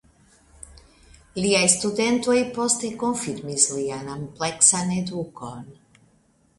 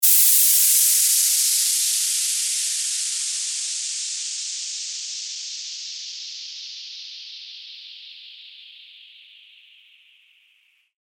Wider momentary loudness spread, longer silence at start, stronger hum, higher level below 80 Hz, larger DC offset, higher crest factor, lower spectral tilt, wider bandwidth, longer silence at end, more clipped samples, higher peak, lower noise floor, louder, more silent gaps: second, 18 LU vs 24 LU; first, 0.7 s vs 0 s; neither; first, -56 dBFS vs under -90 dBFS; neither; about the same, 24 dB vs 20 dB; first, -3 dB/octave vs 12 dB/octave; second, 11.5 kHz vs over 20 kHz; second, 0.85 s vs 2.1 s; neither; first, 0 dBFS vs -4 dBFS; about the same, -61 dBFS vs -62 dBFS; second, -21 LUFS vs -18 LUFS; neither